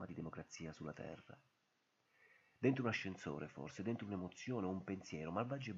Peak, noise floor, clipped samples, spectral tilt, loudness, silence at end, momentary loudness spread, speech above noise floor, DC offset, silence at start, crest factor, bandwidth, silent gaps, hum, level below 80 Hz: -22 dBFS; -82 dBFS; under 0.1%; -6 dB/octave; -45 LUFS; 0 s; 12 LU; 38 dB; under 0.1%; 0 s; 24 dB; 7.6 kHz; none; none; -76 dBFS